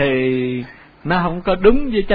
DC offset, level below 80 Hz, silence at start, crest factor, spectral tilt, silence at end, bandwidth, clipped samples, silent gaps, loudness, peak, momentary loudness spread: under 0.1%; -30 dBFS; 0 s; 16 dB; -10 dB/octave; 0 s; 4.9 kHz; under 0.1%; none; -18 LUFS; 0 dBFS; 14 LU